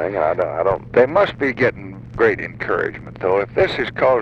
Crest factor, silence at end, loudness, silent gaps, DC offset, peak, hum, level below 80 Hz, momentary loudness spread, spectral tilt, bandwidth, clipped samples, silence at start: 16 dB; 0 s; -19 LUFS; none; under 0.1%; -2 dBFS; none; -44 dBFS; 8 LU; -7 dB/octave; 8 kHz; under 0.1%; 0 s